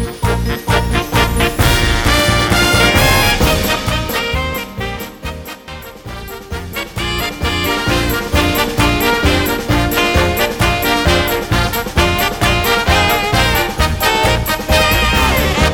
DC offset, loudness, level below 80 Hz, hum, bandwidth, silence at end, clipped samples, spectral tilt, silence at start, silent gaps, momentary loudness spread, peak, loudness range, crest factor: under 0.1%; -14 LUFS; -22 dBFS; none; 19.5 kHz; 0 s; under 0.1%; -4 dB/octave; 0 s; none; 13 LU; 0 dBFS; 8 LU; 14 dB